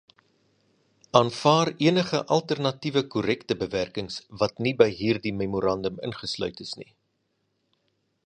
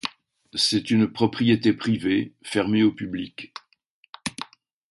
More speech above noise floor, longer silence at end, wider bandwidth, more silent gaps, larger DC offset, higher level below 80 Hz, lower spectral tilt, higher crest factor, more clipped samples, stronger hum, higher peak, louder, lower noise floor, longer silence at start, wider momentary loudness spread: first, 49 dB vs 25 dB; first, 1.45 s vs 0.45 s; about the same, 10.5 kHz vs 11.5 kHz; second, none vs 3.86-4.03 s, 4.09-4.13 s; neither; about the same, -58 dBFS vs -58 dBFS; about the same, -5.5 dB/octave vs -5 dB/octave; first, 26 dB vs 20 dB; neither; neither; about the same, -2 dBFS vs -4 dBFS; about the same, -25 LUFS vs -23 LUFS; first, -74 dBFS vs -47 dBFS; first, 1.15 s vs 0.05 s; second, 11 LU vs 18 LU